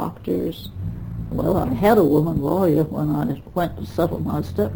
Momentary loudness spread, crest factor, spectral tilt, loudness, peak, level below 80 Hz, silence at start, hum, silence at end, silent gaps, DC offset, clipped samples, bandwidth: 14 LU; 18 dB; -8.5 dB/octave; -21 LUFS; -4 dBFS; -40 dBFS; 0 s; none; 0 s; none; under 0.1%; under 0.1%; over 20 kHz